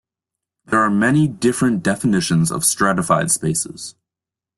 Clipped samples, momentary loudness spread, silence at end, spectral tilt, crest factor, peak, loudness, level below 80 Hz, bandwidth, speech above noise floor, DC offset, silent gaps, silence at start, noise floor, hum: under 0.1%; 6 LU; 0.65 s; -4.5 dB/octave; 16 dB; -2 dBFS; -17 LUFS; -52 dBFS; 12.5 kHz; 70 dB; under 0.1%; none; 0.7 s; -88 dBFS; none